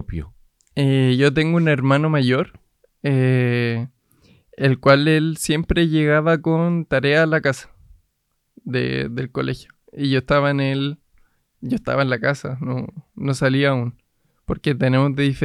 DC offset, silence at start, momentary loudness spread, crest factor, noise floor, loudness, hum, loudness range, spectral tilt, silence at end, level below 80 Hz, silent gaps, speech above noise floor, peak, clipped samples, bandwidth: under 0.1%; 0 s; 13 LU; 20 dB; -71 dBFS; -19 LUFS; none; 5 LU; -6.5 dB/octave; 0 s; -42 dBFS; none; 52 dB; 0 dBFS; under 0.1%; 12.5 kHz